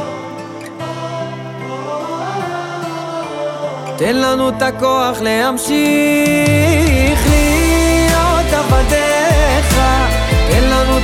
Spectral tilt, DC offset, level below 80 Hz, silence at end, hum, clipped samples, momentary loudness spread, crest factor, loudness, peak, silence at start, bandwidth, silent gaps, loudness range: -5 dB/octave; under 0.1%; -20 dBFS; 0 s; none; under 0.1%; 13 LU; 12 dB; -14 LUFS; -2 dBFS; 0 s; 17 kHz; none; 10 LU